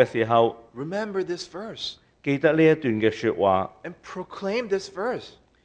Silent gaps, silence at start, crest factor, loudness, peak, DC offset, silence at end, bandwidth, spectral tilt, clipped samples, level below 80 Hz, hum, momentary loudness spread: none; 0 s; 20 dB; -24 LUFS; -4 dBFS; under 0.1%; 0.35 s; 9.4 kHz; -6 dB/octave; under 0.1%; -62 dBFS; none; 16 LU